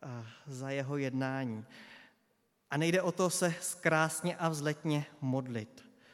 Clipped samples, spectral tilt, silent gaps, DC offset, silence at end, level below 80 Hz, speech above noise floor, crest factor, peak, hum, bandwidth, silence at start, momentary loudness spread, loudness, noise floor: under 0.1%; -5 dB/octave; none; under 0.1%; 0.3 s; -84 dBFS; 42 dB; 22 dB; -14 dBFS; none; 16.5 kHz; 0 s; 16 LU; -34 LUFS; -75 dBFS